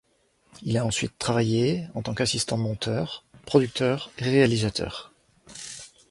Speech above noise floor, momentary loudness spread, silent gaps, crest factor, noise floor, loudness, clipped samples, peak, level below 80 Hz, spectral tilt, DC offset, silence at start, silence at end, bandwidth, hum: 40 dB; 17 LU; none; 22 dB; -65 dBFS; -25 LUFS; under 0.1%; -4 dBFS; -52 dBFS; -5 dB/octave; under 0.1%; 0.6 s; 0.25 s; 11.5 kHz; none